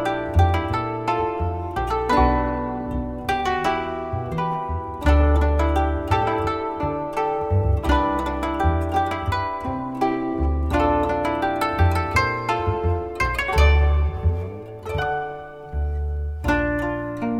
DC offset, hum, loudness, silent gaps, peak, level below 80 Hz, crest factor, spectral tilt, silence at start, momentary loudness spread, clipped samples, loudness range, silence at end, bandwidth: under 0.1%; none; -22 LUFS; none; -4 dBFS; -26 dBFS; 18 dB; -7 dB/octave; 0 s; 9 LU; under 0.1%; 2 LU; 0 s; 13.5 kHz